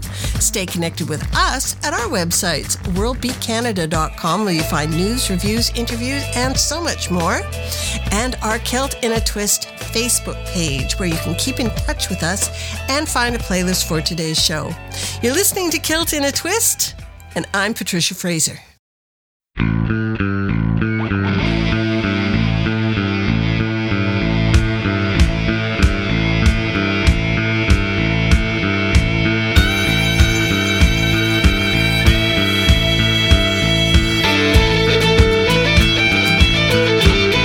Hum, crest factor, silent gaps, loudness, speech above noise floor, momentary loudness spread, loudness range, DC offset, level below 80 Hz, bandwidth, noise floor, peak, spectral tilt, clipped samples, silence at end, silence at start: none; 16 dB; 18.79-19.40 s; -16 LUFS; over 71 dB; 7 LU; 6 LU; under 0.1%; -24 dBFS; 18.5 kHz; under -90 dBFS; 0 dBFS; -4 dB/octave; under 0.1%; 0 s; 0 s